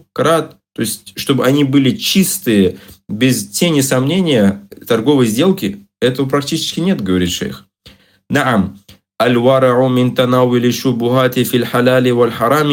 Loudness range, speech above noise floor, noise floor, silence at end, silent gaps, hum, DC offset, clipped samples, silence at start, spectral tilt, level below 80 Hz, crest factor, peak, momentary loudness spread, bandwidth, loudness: 4 LU; 32 dB; -45 dBFS; 0 s; none; none; under 0.1%; under 0.1%; 0.15 s; -5 dB/octave; -54 dBFS; 14 dB; 0 dBFS; 9 LU; 17 kHz; -14 LUFS